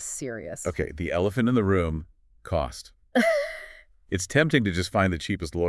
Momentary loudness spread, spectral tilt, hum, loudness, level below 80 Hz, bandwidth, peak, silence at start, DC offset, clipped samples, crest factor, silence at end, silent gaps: 12 LU; -5.5 dB/octave; none; -26 LUFS; -46 dBFS; 12 kHz; -6 dBFS; 0 s; under 0.1%; under 0.1%; 20 dB; 0 s; none